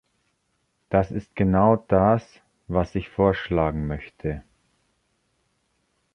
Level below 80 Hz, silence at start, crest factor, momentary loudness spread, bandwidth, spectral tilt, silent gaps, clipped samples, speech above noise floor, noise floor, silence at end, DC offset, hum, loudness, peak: -42 dBFS; 0.9 s; 20 dB; 12 LU; 6.4 kHz; -9 dB/octave; none; under 0.1%; 50 dB; -72 dBFS; 1.75 s; under 0.1%; none; -23 LUFS; -4 dBFS